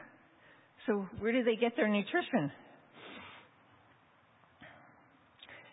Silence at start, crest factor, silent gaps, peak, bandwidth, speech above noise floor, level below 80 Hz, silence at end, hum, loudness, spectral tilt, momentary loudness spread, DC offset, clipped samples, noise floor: 0 s; 20 dB; none; -16 dBFS; 3.9 kHz; 34 dB; -70 dBFS; 0.1 s; none; -33 LUFS; -2.5 dB/octave; 26 LU; under 0.1%; under 0.1%; -66 dBFS